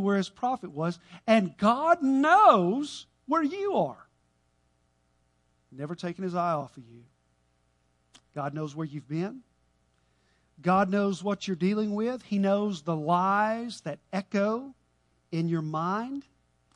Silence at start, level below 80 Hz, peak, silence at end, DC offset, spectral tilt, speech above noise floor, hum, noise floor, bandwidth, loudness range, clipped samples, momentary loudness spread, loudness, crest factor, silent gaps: 0 s; -70 dBFS; -6 dBFS; 0.55 s; under 0.1%; -6.5 dB/octave; 43 dB; 60 Hz at -55 dBFS; -70 dBFS; 11 kHz; 12 LU; under 0.1%; 14 LU; -27 LUFS; 22 dB; none